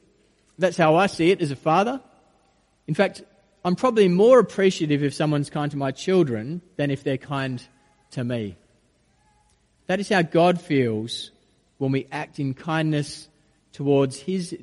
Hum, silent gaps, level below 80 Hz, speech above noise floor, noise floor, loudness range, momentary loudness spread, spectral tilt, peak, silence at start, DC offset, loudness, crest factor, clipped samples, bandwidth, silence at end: none; none; -62 dBFS; 42 dB; -63 dBFS; 8 LU; 13 LU; -6.5 dB/octave; -4 dBFS; 0.6 s; under 0.1%; -22 LUFS; 18 dB; under 0.1%; 11.5 kHz; 0 s